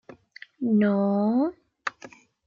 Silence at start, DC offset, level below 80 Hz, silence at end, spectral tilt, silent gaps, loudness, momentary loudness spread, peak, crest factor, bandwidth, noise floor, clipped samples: 0.6 s; under 0.1%; -72 dBFS; 0.4 s; -8 dB/octave; none; -25 LUFS; 13 LU; -10 dBFS; 16 dB; 7.2 kHz; -49 dBFS; under 0.1%